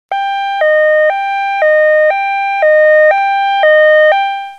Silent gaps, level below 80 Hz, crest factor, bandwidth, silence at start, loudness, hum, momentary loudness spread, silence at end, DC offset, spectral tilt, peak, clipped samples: none; -72 dBFS; 10 dB; 6.6 kHz; 0.1 s; -10 LUFS; none; 8 LU; 0 s; 0.2%; 0.5 dB/octave; 0 dBFS; under 0.1%